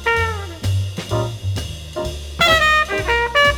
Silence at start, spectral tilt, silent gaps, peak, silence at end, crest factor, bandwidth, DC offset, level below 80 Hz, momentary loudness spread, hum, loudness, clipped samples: 0 s; -4 dB/octave; none; -2 dBFS; 0 s; 16 dB; over 20 kHz; under 0.1%; -32 dBFS; 14 LU; none; -18 LUFS; under 0.1%